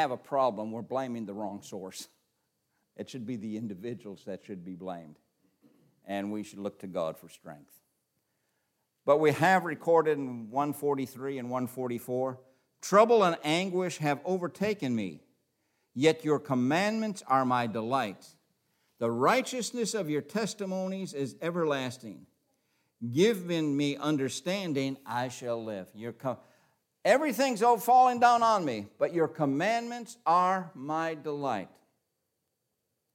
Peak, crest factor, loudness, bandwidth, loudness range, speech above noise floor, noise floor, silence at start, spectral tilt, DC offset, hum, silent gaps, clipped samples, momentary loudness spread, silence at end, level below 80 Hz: -8 dBFS; 22 dB; -29 LUFS; 16.5 kHz; 14 LU; 52 dB; -82 dBFS; 0 s; -5 dB/octave; under 0.1%; none; none; under 0.1%; 17 LU; 1.5 s; -80 dBFS